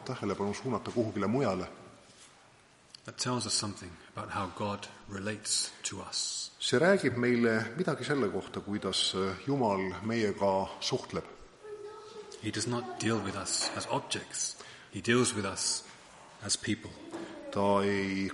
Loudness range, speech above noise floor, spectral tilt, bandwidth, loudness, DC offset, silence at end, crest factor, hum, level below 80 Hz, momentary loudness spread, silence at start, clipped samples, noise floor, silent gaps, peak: 6 LU; 28 dB; -3.5 dB/octave; 11.5 kHz; -32 LUFS; under 0.1%; 0 s; 20 dB; none; -66 dBFS; 17 LU; 0 s; under 0.1%; -60 dBFS; none; -12 dBFS